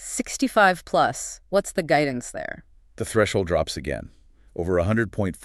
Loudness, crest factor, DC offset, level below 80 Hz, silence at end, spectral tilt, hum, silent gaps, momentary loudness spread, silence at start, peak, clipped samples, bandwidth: -23 LUFS; 20 dB; under 0.1%; -46 dBFS; 0 s; -4.5 dB/octave; none; none; 15 LU; 0 s; -4 dBFS; under 0.1%; 13.5 kHz